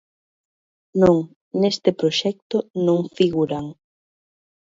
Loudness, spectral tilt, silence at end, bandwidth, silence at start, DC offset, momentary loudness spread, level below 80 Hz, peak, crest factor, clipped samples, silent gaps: -21 LUFS; -6.5 dB/octave; 0.95 s; 7.8 kHz; 0.95 s; under 0.1%; 11 LU; -54 dBFS; -2 dBFS; 20 dB; under 0.1%; 1.36-1.51 s, 2.42-2.50 s, 2.70-2.74 s